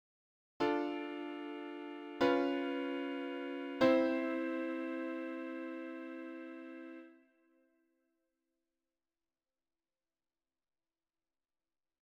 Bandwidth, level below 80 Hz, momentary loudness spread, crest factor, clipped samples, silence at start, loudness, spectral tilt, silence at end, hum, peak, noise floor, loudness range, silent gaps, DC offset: 8.4 kHz; -80 dBFS; 16 LU; 24 dB; under 0.1%; 0.6 s; -37 LUFS; -5.5 dB/octave; 4.9 s; none; -16 dBFS; under -90 dBFS; 17 LU; none; under 0.1%